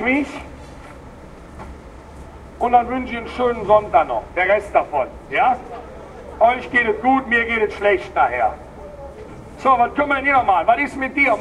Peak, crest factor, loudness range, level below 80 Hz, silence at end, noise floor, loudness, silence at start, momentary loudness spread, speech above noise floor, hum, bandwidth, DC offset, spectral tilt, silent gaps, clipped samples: -2 dBFS; 18 dB; 3 LU; -42 dBFS; 0 s; -39 dBFS; -18 LUFS; 0 s; 22 LU; 21 dB; none; 11.5 kHz; under 0.1%; -5.5 dB/octave; none; under 0.1%